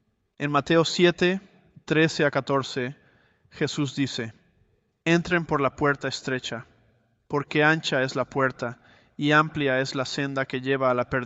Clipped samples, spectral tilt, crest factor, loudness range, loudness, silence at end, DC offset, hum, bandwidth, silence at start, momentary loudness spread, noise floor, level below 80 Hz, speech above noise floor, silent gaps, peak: under 0.1%; -5 dB/octave; 20 dB; 3 LU; -25 LUFS; 0 s; under 0.1%; none; 8.2 kHz; 0.4 s; 11 LU; -66 dBFS; -58 dBFS; 42 dB; none; -6 dBFS